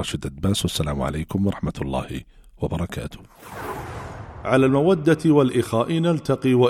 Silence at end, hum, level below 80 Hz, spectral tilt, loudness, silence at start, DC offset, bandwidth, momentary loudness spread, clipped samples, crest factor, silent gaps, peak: 0 s; none; -40 dBFS; -6.5 dB/octave; -22 LUFS; 0 s; under 0.1%; 16.5 kHz; 17 LU; under 0.1%; 16 dB; none; -6 dBFS